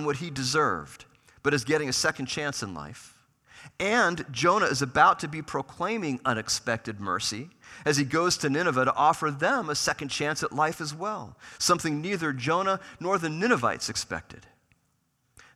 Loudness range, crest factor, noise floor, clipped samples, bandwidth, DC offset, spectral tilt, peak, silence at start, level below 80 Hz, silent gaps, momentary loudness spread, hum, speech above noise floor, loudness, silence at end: 3 LU; 22 dB; -72 dBFS; under 0.1%; 15.5 kHz; under 0.1%; -3.5 dB/octave; -6 dBFS; 0 s; -62 dBFS; none; 11 LU; none; 45 dB; -27 LUFS; 1.15 s